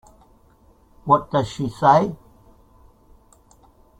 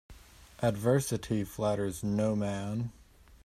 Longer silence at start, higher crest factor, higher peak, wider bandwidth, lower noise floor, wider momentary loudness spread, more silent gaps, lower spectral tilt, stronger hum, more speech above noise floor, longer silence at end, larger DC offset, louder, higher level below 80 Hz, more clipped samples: first, 1.05 s vs 0.1 s; about the same, 22 dB vs 18 dB; first, -2 dBFS vs -14 dBFS; about the same, 14.5 kHz vs 15.5 kHz; about the same, -55 dBFS vs -53 dBFS; first, 17 LU vs 7 LU; neither; about the same, -7 dB/octave vs -6.5 dB/octave; neither; first, 36 dB vs 22 dB; first, 1.85 s vs 0.1 s; neither; first, -19 LUFS vs -32 LUFS; about the same, -52 dBFS vs -56 dBFS; neither